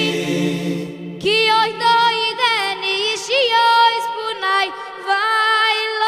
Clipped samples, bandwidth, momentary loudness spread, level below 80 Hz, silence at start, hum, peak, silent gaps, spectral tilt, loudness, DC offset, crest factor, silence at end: under 0.1%; 15.5 kHz; 10 LU; -64 dBFS; 0 s; none; -2 dBFS; none; -3 dB/octave; -16 LUFS; under 0.1%; 14 dB; 0 s